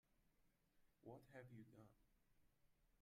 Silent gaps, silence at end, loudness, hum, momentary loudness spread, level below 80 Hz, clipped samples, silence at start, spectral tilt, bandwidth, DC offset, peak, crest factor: none; 0 s; -64 LUFS; none; 6 LU; -84 dBFS; under 0.1%; 0.05 s; -7.5 dB/octave; 13.5 kHz; under 0.1%; -48 dBFS; 20 dB